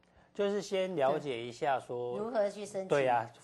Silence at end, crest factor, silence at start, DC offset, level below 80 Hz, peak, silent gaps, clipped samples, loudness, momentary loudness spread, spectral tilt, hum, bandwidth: 0.05 s; 18 dB; 0.35 s; under 0.1%; -74 dBFS; -16 dBFS; none; under 0.1%; -33 LUFS; 8 LU; -5 dB/octave; none; 12.5 kHz